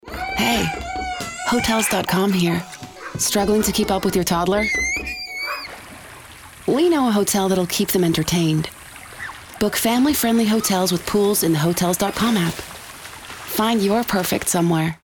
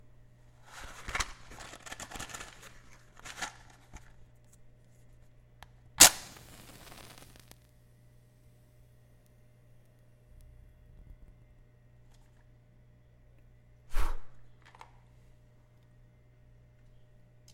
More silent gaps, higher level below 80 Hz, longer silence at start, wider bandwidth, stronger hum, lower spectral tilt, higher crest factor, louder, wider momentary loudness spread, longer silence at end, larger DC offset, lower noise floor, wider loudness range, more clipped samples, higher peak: neither; about the same, -44 dBFS vs -46 dBFS; second, 0.05 s vs 0.75 s; first, over 20 kHz vs 16.5 kHz; neither; first, -4 dB/octave vs 0 dB/octave; second, 12 dB vs 36 dB; first, -19 LUFS vs -27 LUFS; second, 17 LU vs 34 LU; second, 0.05 s vs 3.1 s; neither; second, -41 dBFS vs -60 dBFS; second, 2 LU vs 21 LU; neither; second, -8 dBFS vs 0 dBFS